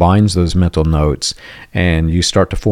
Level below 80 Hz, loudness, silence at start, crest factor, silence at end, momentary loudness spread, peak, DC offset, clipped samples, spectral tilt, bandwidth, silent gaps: -26 dBFS; -14 LUFS; 0 s; 12 dB; 0 s; 8 LU; 0 dBFS; under 0.1%; under 0.1%; -5.5 dB/octave; 13.5 kHz; none